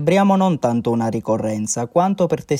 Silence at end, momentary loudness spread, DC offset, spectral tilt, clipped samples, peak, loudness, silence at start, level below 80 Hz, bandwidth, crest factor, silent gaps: 0 s; 6 LU; under 0.1%; -6 dB/octave; under 0.1%; -4 dBFS; -19 LUFS; 0 s; -54 dBFS; 14 kHz; 14 dB; none